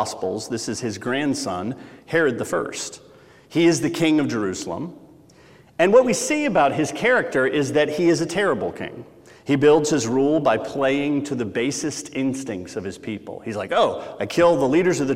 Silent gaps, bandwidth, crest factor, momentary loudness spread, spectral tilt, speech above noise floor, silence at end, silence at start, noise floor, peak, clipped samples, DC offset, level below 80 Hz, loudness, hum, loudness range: none; 15.5 kHz; 18 dB; 14 LU; -4.5 dB/octave; 29 dB; 0 s; 0 s; -50 dBFS; -2 dBFS; under 0.1%; under 0.1%; -58 dBFS; -21 LUFS; none; 5 LU